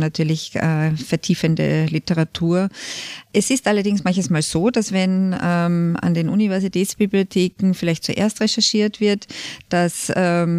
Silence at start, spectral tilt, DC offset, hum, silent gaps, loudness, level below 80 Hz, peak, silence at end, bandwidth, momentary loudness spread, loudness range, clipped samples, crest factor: 0 s; -5 dB/octave; under 0.1%; none; none; -19 LUFS; -52 dBFS; -4 dBFS; 0 s; 15 kHz; 4 LU; 1 LU; under 0.1%; 14 dB